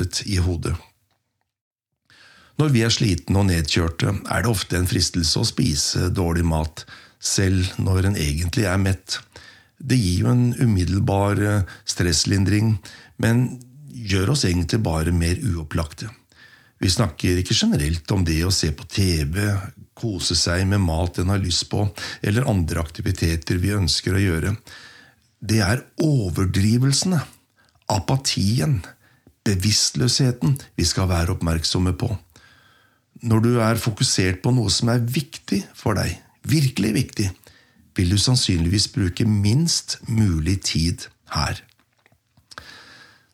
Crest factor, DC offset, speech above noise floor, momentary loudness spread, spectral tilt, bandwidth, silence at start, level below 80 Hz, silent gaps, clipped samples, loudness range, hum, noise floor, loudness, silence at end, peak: 16 dB; under 0.1%; 54 dB; 9 LU; -4.5 dB/octave; 15.5 kHz; 0 s; -40 dBFS; 1.61-1.71 s; under 0.1%; 3 LU; none; -74 dBFS; -21 LUFS; 0.5 s; -6 dBFS